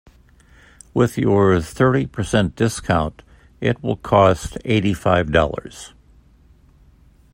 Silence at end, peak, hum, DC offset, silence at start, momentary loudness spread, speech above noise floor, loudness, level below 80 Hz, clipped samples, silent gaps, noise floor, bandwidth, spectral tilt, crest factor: 1.45 s; 0 dBFS; none; under 0.1%; 0.95 s; 11 LU; 33 dB; -19 LUFS; -40 dBFS; under 0.1%; none; -51 dBFS; 16 kHz; -6.5 dB/octave; 20 dB